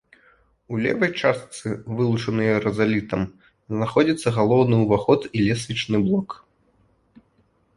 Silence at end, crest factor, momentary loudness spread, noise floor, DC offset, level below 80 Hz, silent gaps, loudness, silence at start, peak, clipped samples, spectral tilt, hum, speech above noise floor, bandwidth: 1.4 s; 20 dB; 12 LU; -63 dBFS; under 0.1%; -52 dBFS; none; -22 LUFS; 0.7 s; -4 dBFS; under 0.1%; -6.5 dB/octave; none; 42 dB; 11.5 kHz